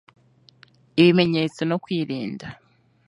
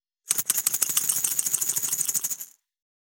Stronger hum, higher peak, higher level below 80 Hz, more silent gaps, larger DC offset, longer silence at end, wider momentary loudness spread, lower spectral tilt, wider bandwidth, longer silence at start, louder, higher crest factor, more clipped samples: neither; about the same, -2 dBFS vs 0 dBFS; first, -62 dBFS vs under -90 dBFS; neither; neither; about the same, 0.55 s vs 0.5 s; first, 17 LU vs 7 LU; first, -7 dB/octave vs 1.5 dB/octave; second, 10.5 kHz vs over 20 kHz; first, 0.95 s vs 0.25 s; about the same, -21 LUFS vs -23 LUFS; second, 20 dB vs 28 dB; neither